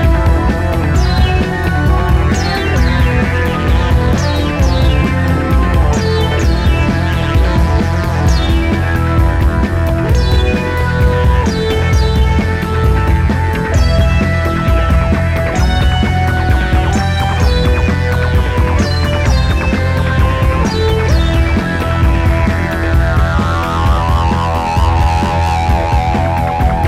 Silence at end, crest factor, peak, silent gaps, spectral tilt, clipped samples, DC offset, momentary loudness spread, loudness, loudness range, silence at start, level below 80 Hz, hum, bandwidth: 0 s; 12 dB; 0 dBFS; none; -6.5 dB/octave; under 0.1%; under 0.1%; 2 LU; -13 LUFS; 0 LU; 0 s; -16 dBFS; none; 14 kHz